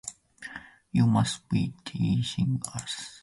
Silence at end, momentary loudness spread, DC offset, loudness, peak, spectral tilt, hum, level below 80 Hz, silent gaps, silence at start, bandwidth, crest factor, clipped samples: 0.05 s; 18 LU; under 0.1%; -28 LUFS; -12 dBFS; -5.5 dB/octave; none; -54 dBFS; none; 0.05 s; 11.5 kHz; 16 dB; under 0.1%